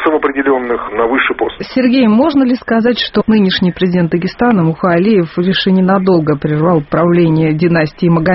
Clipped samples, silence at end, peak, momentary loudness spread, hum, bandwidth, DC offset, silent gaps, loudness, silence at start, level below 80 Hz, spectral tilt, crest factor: under 0.1%; 0 s; 0 dBFS; 4 LU; none; 5.8 kHz; under 0.1%; none; -12 LUFS; 0 s; -42 dBFS; -5.5 dB/octave; 12 dB